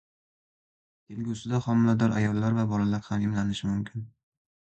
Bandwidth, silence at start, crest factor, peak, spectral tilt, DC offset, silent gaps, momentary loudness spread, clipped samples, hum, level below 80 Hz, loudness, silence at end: 8.6 kHz; 1.1 s; 18 dB; -10 dBFS; -7.5 dB/octave; under 0.1%; none; 13 LU; under 0.1%; none; -54 dBFS; -27 LUFS; 0.7 s